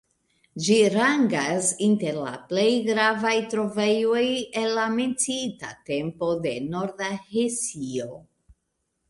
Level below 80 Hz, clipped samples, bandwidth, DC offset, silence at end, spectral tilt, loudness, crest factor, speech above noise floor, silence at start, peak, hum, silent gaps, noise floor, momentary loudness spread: -64 dBFS; under 0.1%; 11.5 kHz; under 0.1%; 0.9 s; -3.5 dB/octave; -24 LUFS; 18 dB; 53 dB; 0.55 s; -8 dBFS; none; none; -77 dBFS; 10 LU